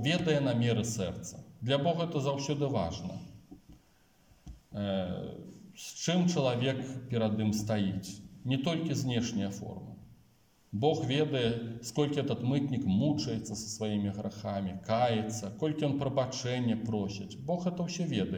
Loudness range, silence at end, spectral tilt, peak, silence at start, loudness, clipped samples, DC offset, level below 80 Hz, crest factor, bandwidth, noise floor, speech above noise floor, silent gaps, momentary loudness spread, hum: 4 LU; 0 s; -6 dB/octave; -16 dBFS; 0 s; -32 LUFS; under 0.1%; under 0.1%; -62 dBFS; 18 dB; 17 kHz; -66 dBFS; 34 dB; none; 13 LU; none